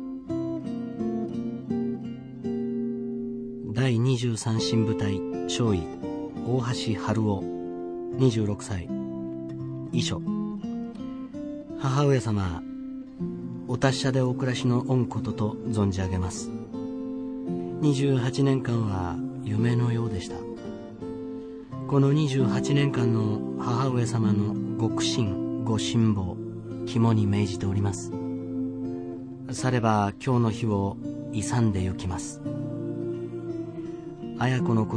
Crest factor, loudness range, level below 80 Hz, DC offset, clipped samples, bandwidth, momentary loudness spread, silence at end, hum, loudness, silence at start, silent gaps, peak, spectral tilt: 18 dB; 4 LU; -54 dBFS; under 0.1%; under 0.1%; 10 kHz; 12 LU; 0 s; none; -28 LUFS; 0 s; none; -8 dBFS; -6.5 dB/octave